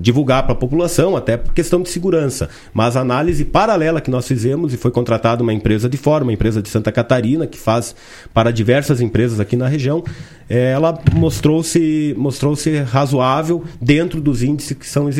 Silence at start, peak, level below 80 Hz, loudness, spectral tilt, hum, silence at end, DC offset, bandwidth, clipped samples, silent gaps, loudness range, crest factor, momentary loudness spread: 0 s; 0 dBFS; -30 dBFS; -16 LUFS; -6.5 dB/octave; none; 0 s; under 0.1%; 16 kHz; under 0.1%; none; 1 LU; 16 dB; 5 LU